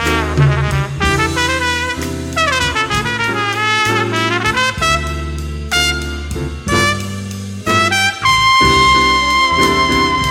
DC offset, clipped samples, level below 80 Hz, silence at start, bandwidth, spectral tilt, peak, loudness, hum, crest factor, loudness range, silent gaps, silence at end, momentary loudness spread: under 0.1%; under 0.1%; -28 dBFS; 0 s; 16.5 kHz; -3.5 dB/octave; 0 dBFS; -14 LUFS; none; 14 dB; 5 LU; none; 0 s; 13 LU